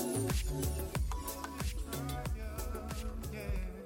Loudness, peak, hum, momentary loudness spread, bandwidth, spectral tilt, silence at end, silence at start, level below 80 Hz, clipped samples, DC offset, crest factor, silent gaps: -39 LUFS; -22 dBFS; none; 6 LU; 17 kHz; -5 dB/octave; 0 s; 0 s; -40 dBFS; under 0.1%; under 0.1%; 16 dB; none